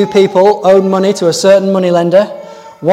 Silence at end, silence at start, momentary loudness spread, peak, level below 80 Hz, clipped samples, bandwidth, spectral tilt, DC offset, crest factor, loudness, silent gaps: 0 s; 0 s; 8 LU; 0 dBFS; -56 dBFS; 0.6%; 14.5 kHz; -5.5 dB/octave; under 0.1%; 10 dB; -10 LUFS; none